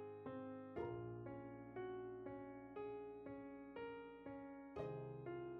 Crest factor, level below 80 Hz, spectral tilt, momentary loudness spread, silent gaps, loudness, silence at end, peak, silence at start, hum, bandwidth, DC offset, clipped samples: 16 dB; -74 dBFS; -7 dB/octave; 5 LU; none; -52 LUFS; 0 s; -34 dBFS; 0 s; none; 5.2 kHz; under 0.1%; under 0.1%